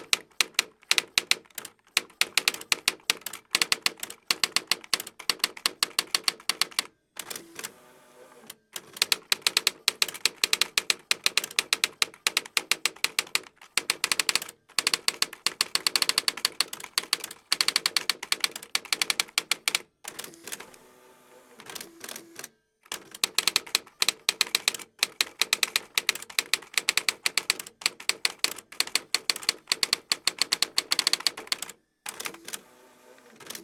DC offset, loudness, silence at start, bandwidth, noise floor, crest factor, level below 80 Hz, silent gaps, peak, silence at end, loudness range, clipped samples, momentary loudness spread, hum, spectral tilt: under 0.1%; -26 LUFS; 0 s; over 20 kHz; -56 dBFS; 26 dB; -74 dBFS; none; -4 dBFS; 0 s; 5 LU; under 0.1%; 15 LU; none; 1.5 dB/octave